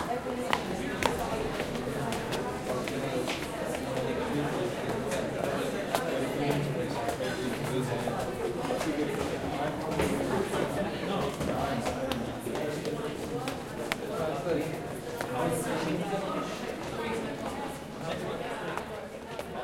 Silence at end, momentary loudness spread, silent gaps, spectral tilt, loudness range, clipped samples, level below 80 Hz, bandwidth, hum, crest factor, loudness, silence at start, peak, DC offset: 0 s; 6 LU; none; -5 dB/octave; 2 LU; under 0.1%; -52 dBFS; 16.5 kHz; none; 28 dB; -32 LUFS; 0 s; -4 dBFS; under 0.1%